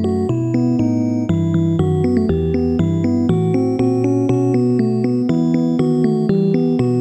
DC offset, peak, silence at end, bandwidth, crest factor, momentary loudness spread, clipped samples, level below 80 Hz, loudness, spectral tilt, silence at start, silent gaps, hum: under 0.1%; -4 dBFS; 0 s; 8.6 kHz; 12 dB; 2 LU; under 0.1%; -40 dBFS; -17 LUFS; -9.5 dB/octave; 0 s; none; none